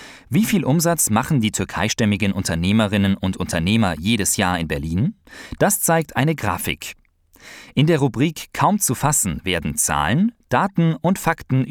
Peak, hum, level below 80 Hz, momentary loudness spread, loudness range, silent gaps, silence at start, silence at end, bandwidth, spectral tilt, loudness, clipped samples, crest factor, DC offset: -2 dBFS; none; -44 dBFS; 6 LU; 2 LU; none; 0 s; 0 s; 19.5 kHz; -4.5 dB/octave; -19 LUFS; under 0.1%; 16 dB; under 0.1%